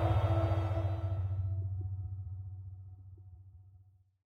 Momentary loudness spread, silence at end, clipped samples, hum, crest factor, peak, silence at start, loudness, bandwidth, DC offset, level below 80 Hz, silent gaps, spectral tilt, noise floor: 23 LU; 0.6 s; under 0.1%; none; 16 dB; -20 dBFS; 0 s; -36 LUFS; 4.9 kHz; under 0.1%; -48 dBFS; none; -9 dB/octave; -62 dBFS